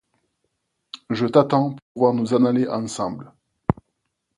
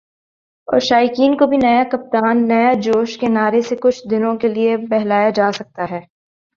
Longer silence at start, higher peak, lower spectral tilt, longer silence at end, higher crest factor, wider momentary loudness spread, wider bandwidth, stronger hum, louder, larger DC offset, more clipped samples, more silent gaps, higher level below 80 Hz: first, 0.95 s vs 0.7 s; about the same, 0 dBFS vs -2 dBFS; first, -7 dB/octave vs -5.5 dB/octave; about the same, 0.65 s vs 0.55 s; first, 22 dB vs 14 dB; first, 13 LU vs 8 LU; first, 11.5 kHz vs 7.4 kHz; neither; second, -21 LUFS vs -16 LUFS; neither; neither; first, 1.82-1.95 s vs none; first, -50 dBFS vs -56 dBFS